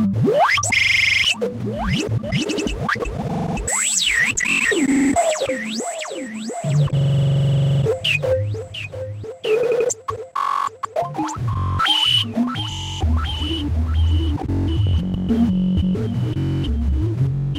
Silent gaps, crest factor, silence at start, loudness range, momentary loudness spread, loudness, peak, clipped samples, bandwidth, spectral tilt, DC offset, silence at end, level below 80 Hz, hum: none; 12 dB; 0 s; 3 LU; 10 LU; -19 LUFS; -6 dBFS; under 0.1%; 15.5 kHz; -4.5 dB/octave; under 0.1%; 0 s; -30 dBFS; none